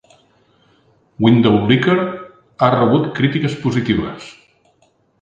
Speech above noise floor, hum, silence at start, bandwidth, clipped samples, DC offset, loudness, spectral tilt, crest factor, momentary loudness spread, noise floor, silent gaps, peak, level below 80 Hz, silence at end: 44 dB; none; 1.2 s; 8 kHz; under 0.1%; under 0.1%; -16 LUFS; -7.5 dB/octave; 18 dB; 15 LU; -59 dBFS; none; 0 dBFS; -48 dBFS; 0.9 s